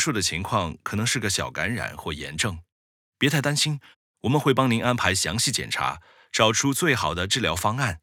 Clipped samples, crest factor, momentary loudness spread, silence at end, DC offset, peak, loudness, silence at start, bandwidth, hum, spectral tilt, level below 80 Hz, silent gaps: under 0.1%; 22 dB; 9 LU; 0.05 s; under 0.1%; -4 dBFS; -24 LUFS; 0 s; 19 kHz; none; -3.5 dB/octave; -52 dBFS; 2.72-3.12 s, 3.96-4.14 s